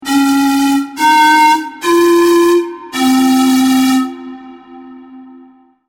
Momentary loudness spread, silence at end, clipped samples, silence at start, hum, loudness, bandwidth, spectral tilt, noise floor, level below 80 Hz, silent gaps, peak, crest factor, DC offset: 8 LU; 0.65 s; under 0.1%; 0 s; none; -11 LUFS; 17.5 kHz; -2.5 dB/octave; -43 dBFS; -54 dBFS; none; -2 dBFS; 10 dB; under 0.1%